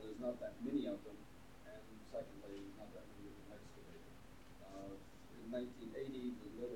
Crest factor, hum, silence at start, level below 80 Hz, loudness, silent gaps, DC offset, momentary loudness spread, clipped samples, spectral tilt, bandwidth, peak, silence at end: 20 dB; none; 0 s; -68 dBFS; -50 LUFS; none; under 0.1%; 17 LU; under 0.1%; -6.5 dB/octave; 18 kHz; -30 dBFS; 0 s